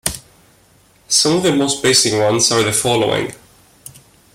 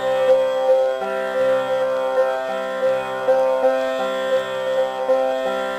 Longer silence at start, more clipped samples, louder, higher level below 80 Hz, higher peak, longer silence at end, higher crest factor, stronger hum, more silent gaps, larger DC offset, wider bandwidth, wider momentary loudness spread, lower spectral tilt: about the same, 0.05 s vs 0 s; neither; first, -14 LUFS vs -20 LUFS; first, -50 dBFS vs -62 dBFS; first, 0 dBFS vs -6 dBFS; first, 1 s vs 0 s; about the same, 18 dB vs 14 dB; neither; neither; neither; about the same, 16.5 kHz vs 15 kHz; first, 10 LU vs 5 LU; about the same, -3 dB/octave vs -4 dB/octave